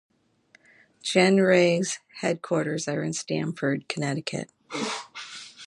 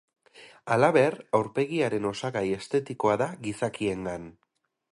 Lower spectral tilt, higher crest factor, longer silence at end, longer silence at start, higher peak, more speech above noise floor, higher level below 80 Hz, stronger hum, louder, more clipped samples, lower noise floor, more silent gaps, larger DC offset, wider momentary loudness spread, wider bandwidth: second, -4.5 dB/octave vs -6 dB/octave; about the same, 22 dB vs 20 dB; second, 0 s vs 0.65 s; first, 1.05 s vs 0.35 s; first, -4 dBFS vs -8 dBFS; first, 37 dB vs 27 dB; second, -72 dBFS vs -62 dBFS; neither; about the same, -25 LUFS vs -27 LUFS; neither; first, -61 dBFS vs -53 dBFS; neither; neither; first, 16 LU vs 12 LU; about the same, 11.5 kHz vs 11.5 kHz